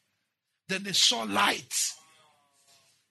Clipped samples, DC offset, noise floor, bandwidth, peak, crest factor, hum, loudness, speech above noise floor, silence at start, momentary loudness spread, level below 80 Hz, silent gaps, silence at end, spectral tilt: under 0.1%; under 0.1%; -81 dBFS; 12.5 kHz; -10 dBFS; 22 dB; none; -26 LUFS; 54 dB; 0.7 s; 10 LU; -86 dBFS; none; 1.15 s; -0.5 dB/octave